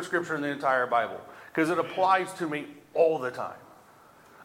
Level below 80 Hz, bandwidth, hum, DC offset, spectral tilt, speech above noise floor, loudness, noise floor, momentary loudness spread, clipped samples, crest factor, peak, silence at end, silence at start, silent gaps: -76 dBFS; 16.5 kHz; none; under 0.1%; -5 dB/octave; 27 dB; -28 LUFS; -55 dBFS; 11 LU; under 0.1%; 18 dB; -10 dBFS; 0 s; 0 s; none